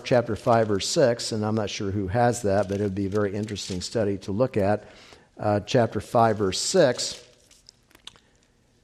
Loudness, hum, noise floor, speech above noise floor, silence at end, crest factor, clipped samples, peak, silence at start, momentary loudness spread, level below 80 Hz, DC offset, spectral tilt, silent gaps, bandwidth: -24 LUFS; none; -62 dBFS; 38 dB; 1.6 s; 18 dB; under 0.1%; -6 dBFS; 0 s; 8 LU; -58 dBFS; under 0.1%; -5 dB/octave; none; 14 kHz